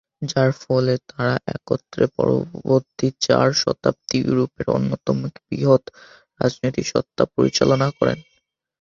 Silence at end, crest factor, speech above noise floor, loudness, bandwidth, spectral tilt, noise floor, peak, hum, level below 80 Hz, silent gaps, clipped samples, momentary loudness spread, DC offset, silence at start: 0.6 s; 18 dB; 48 dB; -21 LUFS; 7.6 kHz; -5.5 dB/octave; -68 dBFS; -2 dBFS; none; -52 dBFS; none; under 0.1%; 7 LU; under 0.1%; 0.2 s